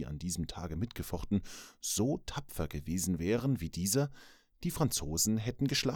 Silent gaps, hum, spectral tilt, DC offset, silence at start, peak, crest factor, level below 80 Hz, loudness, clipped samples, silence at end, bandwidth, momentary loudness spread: none; none; -4.5 dB/octave; under 0.1%; 0 s; -16 dBFS; 20 dB; -50 dBFS; -34 LUFS; under 0.1%; 0 s; over 20 kHz; 9 LU